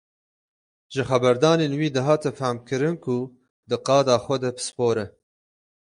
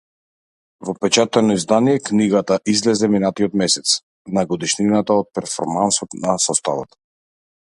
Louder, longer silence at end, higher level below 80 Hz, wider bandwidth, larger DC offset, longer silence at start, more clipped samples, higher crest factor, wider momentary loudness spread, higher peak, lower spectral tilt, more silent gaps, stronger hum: second, -23 LUFS vs -18 LUFS; about the same, 0.75 s vs 0.8 s; second, -62 dBFS vs -56 dBFS; about the same, 11.5 kHz vs 11.5 kHz; neither; about the same, 0.9 s vs 0.8 s; neither; about the same, 20 dB vs 18 dB; about the same, 10 LU vs 8 LU; second, -4 dBFS vs 0 dBFS; first, -5.5 dB/octave vs -4 dB/octave; second, 3.50-3.63 s vs 4.03-4.25 s; neither